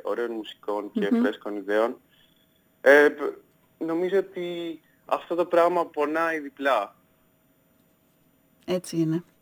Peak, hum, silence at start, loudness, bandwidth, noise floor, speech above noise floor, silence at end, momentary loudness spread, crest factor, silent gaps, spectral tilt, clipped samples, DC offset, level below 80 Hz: -4 dBFS; none; 0.05 s; -25 LUFS; over 20 kHz; -64 dBFS; 39 dB; 0.2 s; 15 LU; 22 dB; none; -5.5 dB/octave; under 0.1%; under 0.1%; -76 dBFS